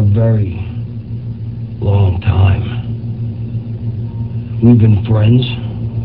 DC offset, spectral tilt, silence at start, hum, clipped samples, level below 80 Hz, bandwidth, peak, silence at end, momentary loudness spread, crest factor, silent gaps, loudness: 0.7%; -12 dB/octave; 0 s; none; under 0.1%; -28 dBFS; 4.3 kHz; 0 dBFS; 0 s; 14 LU; 14 dB; none; -15 LUFS